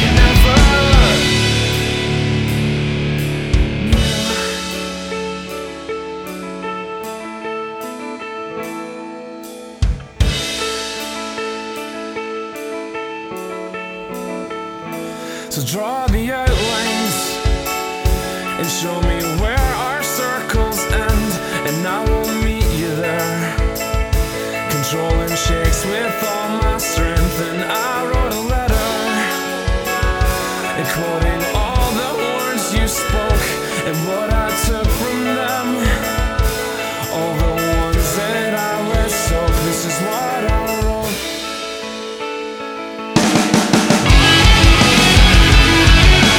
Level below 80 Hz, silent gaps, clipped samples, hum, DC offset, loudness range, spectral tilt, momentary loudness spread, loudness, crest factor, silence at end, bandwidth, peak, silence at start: -20 dBFS; none; under 0.1%; none; under 0.1%; 11 LU; -4 dB/octave; 15 LU; -17 LUFS; 16 dB; 0 s; 19 kHz; 0 dBFS; 0 s